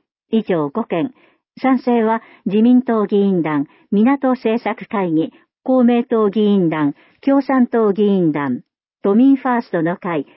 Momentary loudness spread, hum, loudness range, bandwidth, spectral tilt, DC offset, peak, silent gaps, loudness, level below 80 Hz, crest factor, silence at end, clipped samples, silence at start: 9 LU; none; 1 LU; 5.8 kHz; -12.5 dB/octave; under 0.1%; -4 dBFS; none; -17 LUFS; -68 dBFS; 12 dB; 0.15 s; under 0.1%; 0.3 s